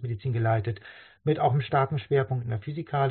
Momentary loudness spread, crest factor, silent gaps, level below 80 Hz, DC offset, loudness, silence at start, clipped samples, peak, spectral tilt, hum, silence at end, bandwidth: 9 LU; 16 dB; none; -60 dBFS; under 0.1%; -27 LUFS; 0 s; under 0.1%; -12 dBFS; -6.5 dB/octave; none; 0 s; 4.4 kHz